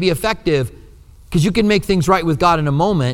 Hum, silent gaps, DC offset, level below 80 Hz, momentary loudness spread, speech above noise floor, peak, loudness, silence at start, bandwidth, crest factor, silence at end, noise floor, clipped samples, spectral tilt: none; none; under 0.1%; -36 dBFS; 5 LU; 26 dB; 0 dBFS; -16 LUFS; 0 s; 16.5 kHz; 16 dB; 0 s; -42 dBFS; under 0.1%; -6 dB/octave